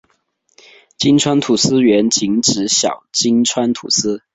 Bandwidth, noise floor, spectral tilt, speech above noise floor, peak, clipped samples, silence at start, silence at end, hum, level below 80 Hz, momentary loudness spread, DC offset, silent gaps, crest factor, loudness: 8.2 kHz; -62 dBFS; -3.5 dB/octave; 48 dB; 0 dBFS; under 0.1%; 1 s; 0.15 s; none; -54 dBFS; 5 LU; under 0.1%; none; 16 dB; -14 LUFS